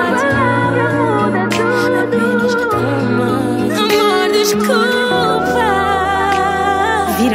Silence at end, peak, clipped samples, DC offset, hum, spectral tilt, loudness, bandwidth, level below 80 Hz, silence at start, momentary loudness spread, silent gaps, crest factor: 0 s; 0 dBFS; under 0.1%; under 0.1%; none; -5 dB/octave; -14 LUFS; 16 kHz; -42 dBFS; 0 s; 3 LU; none; 12 dB